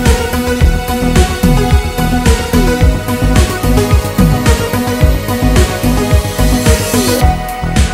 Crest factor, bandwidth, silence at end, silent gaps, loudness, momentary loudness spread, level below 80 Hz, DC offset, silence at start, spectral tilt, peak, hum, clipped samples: 10 dB; 16.5 kHz; 0 s; none; -12 LUFS; 3 LU; -14 dBFS; under 0.1%; 0 s; -5.5 dB/octave; 0 dBFS; none; 0.7%